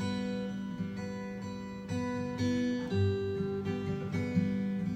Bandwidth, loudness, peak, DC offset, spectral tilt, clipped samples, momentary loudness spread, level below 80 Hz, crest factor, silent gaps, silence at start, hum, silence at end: 9 kHz; -34 LUFS; -18 dBFS; under 0.1%; -7.5 dB/octave; under 0.1%; 8 LU; -62 dBFS; 16 dB; none; 0 s; none; 0 s